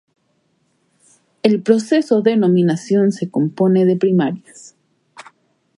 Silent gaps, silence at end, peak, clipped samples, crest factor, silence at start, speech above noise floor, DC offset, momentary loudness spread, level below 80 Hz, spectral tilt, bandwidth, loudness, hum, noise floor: none; 0.55 s; 0 dBFS; under 0.1%; 18 dB; 1.45 s; 49 dB; under 0.1%; 6 LU; -68 dBFS; -7.5 dB/octave; 11.5 kHz; -16 LUFS; none; -64 dBFS